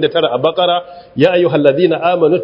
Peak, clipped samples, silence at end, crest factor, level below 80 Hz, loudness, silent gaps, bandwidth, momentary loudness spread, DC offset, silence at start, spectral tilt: 0 dBFS; under 0.1%; 0 s; 12 dB; -56 dBFS; -13 LUFS; none; 5.4 kHz; 4 LU; under 0.1%; 0 s; -8 dB/octave